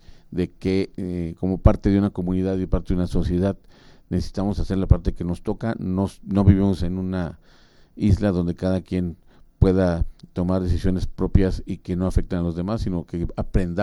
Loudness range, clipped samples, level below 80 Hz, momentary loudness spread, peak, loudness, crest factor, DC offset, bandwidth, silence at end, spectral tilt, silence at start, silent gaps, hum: 2 LU; under 0.1%; -30 dBFS; 9 LU; -2 dBFS; -23 LUFS; 20 dB; under 0.1%; 11.5 kHz; 0 s; -9 dB/octave; 0.1 s; none; none